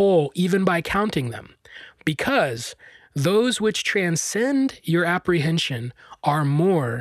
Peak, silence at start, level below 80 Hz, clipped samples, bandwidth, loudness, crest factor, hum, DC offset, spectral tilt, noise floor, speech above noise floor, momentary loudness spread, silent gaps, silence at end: -6 dBFS; 0 s; -54 dBFS; under 0.1%; 14.5 kHz; -22 LUFS; 16 dB; none; under 0.1%; -5 dB/octave; -43 dBFS; 22 dB; 12 LU; none; 0 s